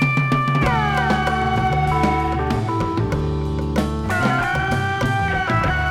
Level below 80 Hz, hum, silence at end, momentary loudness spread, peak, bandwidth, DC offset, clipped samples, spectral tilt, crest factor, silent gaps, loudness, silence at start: -30 dBFS; none; 0 s; 4 LU; -4 dBFS; 15 kHz; under 0.1%; under 0.1%; -6.5 dB/octave; 14 dB; none; -20 LUFS; 0 s